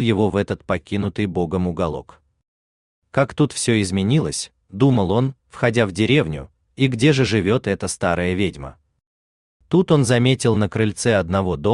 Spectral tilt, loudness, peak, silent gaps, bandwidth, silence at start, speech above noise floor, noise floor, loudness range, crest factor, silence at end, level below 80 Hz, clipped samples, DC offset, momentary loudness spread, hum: -6 dB/octave; -20 LUFS; -2 dBFS; 2.48-3.02 s, 9.06-9.60 s; 12.5 kHz; 0 s; over 71 dB; under -90 dBFS; 4 LU; 18 dB; 0 s; -48 dBFS; under 0.1%; under 0.1%; 9 LU; none